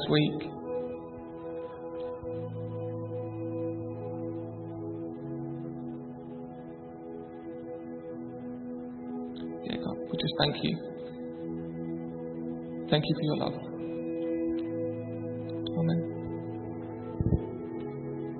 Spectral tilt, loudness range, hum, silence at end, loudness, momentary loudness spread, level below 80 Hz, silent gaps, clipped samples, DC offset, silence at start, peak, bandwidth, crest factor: -10.5 dB/octave; 8 LU; none; 0 s; -35 LUFS; 12 LU; -54 dBFS; none; under 0.1%; under 0.1%; 0 s; -10 dBFS; 4.5 kHz; 24 dB